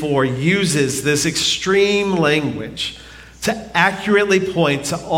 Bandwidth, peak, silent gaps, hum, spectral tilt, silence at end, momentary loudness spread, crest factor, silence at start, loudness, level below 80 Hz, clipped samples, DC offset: 16.5 kHz; -2 dBFS; none; none; -4 dB/octave; 0 s; 9 LU; 16 dB; 0 s; -17 LUFS; -46 dBFS; under 0.1%; under 0.1%